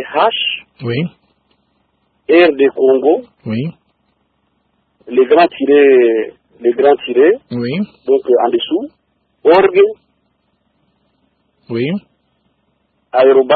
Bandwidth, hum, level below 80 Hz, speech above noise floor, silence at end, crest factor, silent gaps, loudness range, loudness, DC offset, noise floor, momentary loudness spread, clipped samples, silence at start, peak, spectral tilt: 4.7 kHz; none; -60 dBFS; 51 dB; 0 s; 14 dB; none; 5 LU; -13 LUFS; under 0.1%; -63 dBFS; 14 LU; under 0.1%; 0 s; 0 dBFS; -9 dB/octave